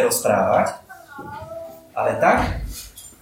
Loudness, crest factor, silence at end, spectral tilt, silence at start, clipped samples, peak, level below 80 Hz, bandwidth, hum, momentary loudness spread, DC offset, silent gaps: -20 LUFS; 18 dB; 0.1 s; -4 dB/octave; 0 s; under 0.1%; -4 dBFS; -38 dBFS; 16.5 kHz; none; 20 LU; under 0.1%; none